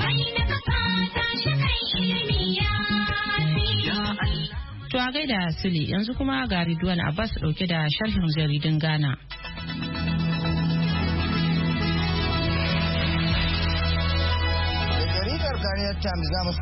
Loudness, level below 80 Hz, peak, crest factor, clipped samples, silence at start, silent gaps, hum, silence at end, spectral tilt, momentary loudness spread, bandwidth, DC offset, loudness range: -25 LUFS; -34 dBFS; -12 dBFS; 12 dB; under 0.1%; 0 s; none; none; 0 s; -9.5 dB/octave; 4 LU; 5.8 kHz; under 0.1%; 2 LU